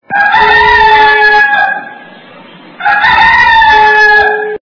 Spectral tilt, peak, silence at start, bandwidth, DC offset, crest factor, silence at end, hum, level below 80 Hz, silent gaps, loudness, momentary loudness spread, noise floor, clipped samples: -3 dB/octave; 0 dBFS; 0.1 s; 5.4 kHz; under 0.1%; 8 dB; 0.05 s; none; -34 dBFS; none; -5 LUFS; 7 LU; -33 dBFS; 3%